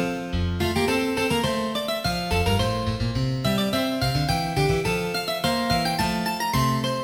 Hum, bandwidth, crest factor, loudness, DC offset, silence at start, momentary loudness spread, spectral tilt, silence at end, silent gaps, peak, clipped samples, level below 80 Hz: none; over 20 kHz; 14 dB; -24 LUFS; under 0.1%; 0 s; 3 LU; -5 dB/octave; 0 s; none; -10 dBFS; under 0.1%; -38 dBFS